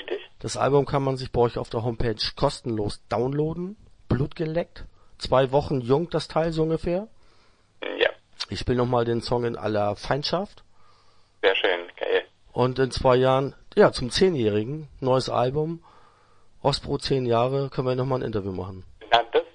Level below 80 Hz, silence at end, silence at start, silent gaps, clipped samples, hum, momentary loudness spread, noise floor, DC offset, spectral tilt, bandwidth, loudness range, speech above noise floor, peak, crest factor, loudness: -44 dBFS; 0.05 s; 0 s; none; under 0.1%; none; 12 LU; -57 dBFS; under 0.1%; -6 dB/octave; 10.5 kHz; 4 LU; 33 dB; -2 dBFS; 22 dB; -25 LUFS